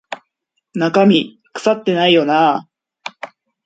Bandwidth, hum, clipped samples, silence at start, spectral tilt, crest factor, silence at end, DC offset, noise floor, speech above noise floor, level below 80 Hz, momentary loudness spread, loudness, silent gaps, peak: 8.8 kHz; none; under 0.1%; 0.1 s; -6 dB/octave; 16 dB; 0.4 s; under 0.1%; -72 dBFS; 58 dB; -64 dBFS; 20 LU; -15 LUFS; none; -2 dBFS